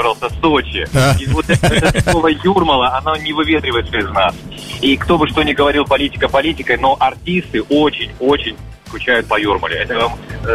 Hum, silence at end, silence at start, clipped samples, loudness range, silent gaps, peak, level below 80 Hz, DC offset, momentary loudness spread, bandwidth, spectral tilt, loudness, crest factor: none; 0 s; 0 s; under 0.1%; 2 LU; none; -2 dBFS; -30 dBFS; 0.2%; 5 LU; 15.5 kHz; -5 dB/octave; -15 LUFS; 12 dB